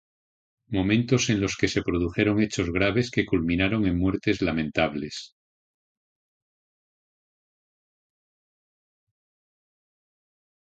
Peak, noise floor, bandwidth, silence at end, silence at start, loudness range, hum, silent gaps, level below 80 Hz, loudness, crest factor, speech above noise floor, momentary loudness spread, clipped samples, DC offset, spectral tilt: -6 dBFS; under -90 dBFS; 9 kHz; 5.35 s; 0.7 s; 9 LU; none; none; -46 dBFS; -25 LUFS; 22 dB; over 66 dB; 5 LU; under 0.1%; under 0.1%; -5.5 dB/octave